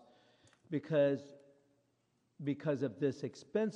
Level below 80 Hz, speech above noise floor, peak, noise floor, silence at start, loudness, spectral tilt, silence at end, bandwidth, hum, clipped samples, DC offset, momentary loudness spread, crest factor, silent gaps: -84 dBFS; 43 dB; -20 dBFS; -78 dBFS; 0.7 s; -37 LUFS; -7.5 dB/octave; 0 s; 9 kHz; none; under 0.1%; under 0.1%; 12 LU; 18 dB; none